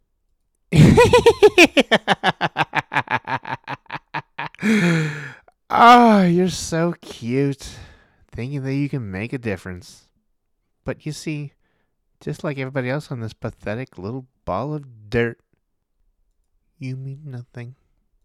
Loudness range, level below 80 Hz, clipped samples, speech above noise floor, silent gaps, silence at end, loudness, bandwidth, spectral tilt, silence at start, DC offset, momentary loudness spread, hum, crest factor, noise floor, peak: 15 LU; -44 dBFS; under 0.1%; 51 dB; none; 0.5 s; -18 LUFS; 17 kHz; -5.5 dB/octave; 0.7 s; under 0.1%; 22 LU; none; 18 dB; -70 dBFS; -2 dBFS